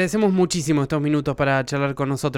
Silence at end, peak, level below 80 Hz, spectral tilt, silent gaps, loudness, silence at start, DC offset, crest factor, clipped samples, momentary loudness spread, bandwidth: 0 s; -8 dBFS; -48 dBFS; -5.5 dB/octave; none; -21 LUFS; 0 s; under 0.1%; 12 dB; under 0.1%; 4 LU; 16 kHz